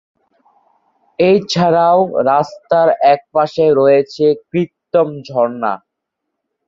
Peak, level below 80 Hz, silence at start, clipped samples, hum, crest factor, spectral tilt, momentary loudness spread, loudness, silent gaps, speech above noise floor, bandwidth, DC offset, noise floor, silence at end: -2 dBFS; -58 dBFS; 1.2 s; under 0.1%; none; 14 dB; -6.5 dB/octave; 9 LU; -14 LUFS; none; 63 dB; 7.6 kHz; under 0.1%; -76 dBFS; 0.9 s